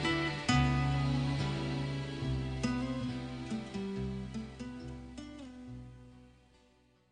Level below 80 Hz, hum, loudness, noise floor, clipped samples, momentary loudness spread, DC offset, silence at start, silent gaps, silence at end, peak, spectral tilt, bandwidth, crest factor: -48 dBFS; none; -35 LUFS; -67 dBFS; under 0.1%; 17 LU; under 0.1%; 0 s; none; 0.85 s; -14 dBFS; -6 dB/octave; 10 kHz; 22 dB